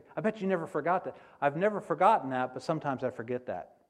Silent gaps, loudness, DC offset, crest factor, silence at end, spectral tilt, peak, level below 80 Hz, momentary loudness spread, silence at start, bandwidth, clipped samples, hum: none; -31 LUFS; under 0.1%; 20 dB; 0.25 s; -7 dB/octave; -10 dBFS; -74 dBFS; 11 LU; 0.15 s; 11.5 kHz; under 0.1%; none